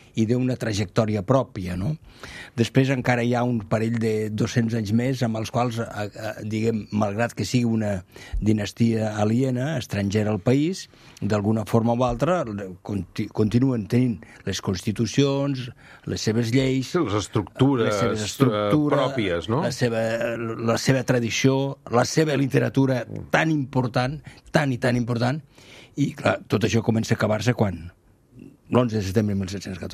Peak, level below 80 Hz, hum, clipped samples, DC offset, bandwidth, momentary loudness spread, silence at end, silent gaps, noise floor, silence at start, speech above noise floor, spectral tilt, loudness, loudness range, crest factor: -2 dBFS; -48 dBFS; none; under 0.1%; under 0.1%; 14.5 kHz; 9 LU; 0 s; none; -48 dBFS; 0.15 s; 25 dB; -6 dB/octave; -23 LUFS; 3 LU; 20 dB